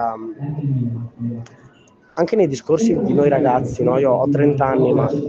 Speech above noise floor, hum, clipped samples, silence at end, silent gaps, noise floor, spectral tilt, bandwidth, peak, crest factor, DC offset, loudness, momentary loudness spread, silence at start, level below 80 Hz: 33 dB; none; under 0.1%; 0 s; none; -50 dBFS; -8 dB/octave; 8 kHz; -4 dBFS; 14 dB; under 0.1%; -18 LUFS; 12 LU; 0 s; -50 dBFS